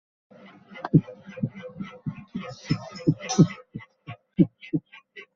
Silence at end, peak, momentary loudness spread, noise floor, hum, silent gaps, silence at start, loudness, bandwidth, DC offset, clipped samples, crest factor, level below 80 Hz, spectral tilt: 0.1 s; -4 dBFS; 21 LU; -48 dBFS; none; none; 0.75 s; -27 LUFS; 7.4 kHz; under 0.1%; under 0.1%; 22 dB; -60 dBFS; -7.5 dB/octave